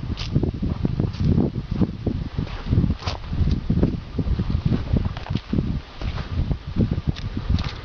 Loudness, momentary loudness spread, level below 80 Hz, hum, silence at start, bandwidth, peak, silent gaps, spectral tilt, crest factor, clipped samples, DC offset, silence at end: -25 LUFS; 7 LU; -28 dBFS; none; 0 s; 6.6 kHz; -4 dBFS; none; -8.5 dB/octave; 18 dB; under 0.1%; 0.1%; 0 s